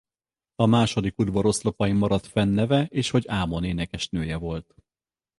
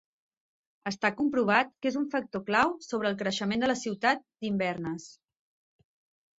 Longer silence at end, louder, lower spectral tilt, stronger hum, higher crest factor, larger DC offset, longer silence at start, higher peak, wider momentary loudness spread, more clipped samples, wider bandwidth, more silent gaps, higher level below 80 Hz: second, 0.8 s vs 1.3 s; first, -24 LUFS vs -29 LUFS; first, -6 dB/octave vs -4.5 dB/octave; neither; about the same, 20 dB vs 22 dB; neither; second, 0.6 s vs 0.85 s; about the same, -6 dBFS vs -8 dBFS; about the same, 7 LU vs 9 LU; neither; first, 11.5 kHz vs 8 kHz; neither; first, -44 dBFS vs -68 dBFS